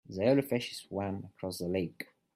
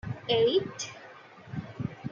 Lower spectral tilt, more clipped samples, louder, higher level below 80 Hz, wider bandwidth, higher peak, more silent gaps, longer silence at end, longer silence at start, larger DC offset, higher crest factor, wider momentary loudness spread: first, -6 dB/octave vs -4.5 dB/octave; neither; second, -34 LUFS vs -30 LUFS; second, -70 dBFS vs -60 dBFS; first, 16 kHz vs 7.6 kHz; about the same, -16 dBFS vs -14 dBFS; neither; first, 0.3 s vs 0 s; about the same, 0.1 s vs 0.05 s; neither; about the same, 18 dB vs 18 dB; second, 12 LU vs 23 LU